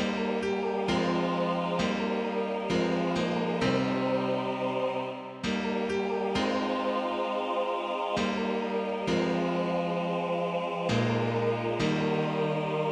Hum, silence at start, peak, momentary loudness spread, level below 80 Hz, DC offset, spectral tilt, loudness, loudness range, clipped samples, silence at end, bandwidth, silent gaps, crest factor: none; 0 s; -14 dBFS; 3 LU; -58 dBFS; under 0.1%; -6 dB/octave; -29 LUFS; 1 LU; under 0.1%; 0 s; 10.5 kHz; none; 14 dB